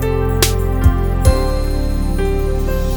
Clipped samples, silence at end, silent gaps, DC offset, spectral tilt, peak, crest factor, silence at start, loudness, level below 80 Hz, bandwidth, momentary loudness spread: under 0.1%; 0 s; none; under 0.1%; -5.5 dB/octave; 0 dBFS; 14 dB; 0 s; -17 LUFS; -16 dBFS; over 20 kHz; 5 LU